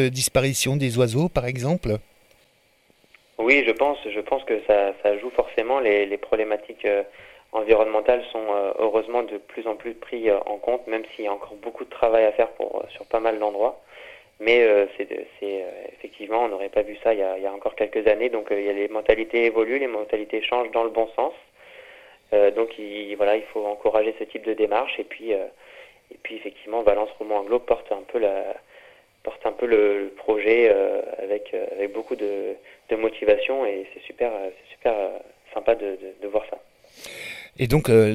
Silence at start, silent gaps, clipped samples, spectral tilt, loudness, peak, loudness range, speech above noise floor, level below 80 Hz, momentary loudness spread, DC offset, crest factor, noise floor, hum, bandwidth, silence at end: 0 s; none; under 0.1%; -5 dB/octave; -23 LUFS; -2 dBFS; 4 LU; 38 dB; -50 dBFS; 15 LU; under 0.1%; 22 dB; -61 dBFS; none; 15.5 kHz; 0 s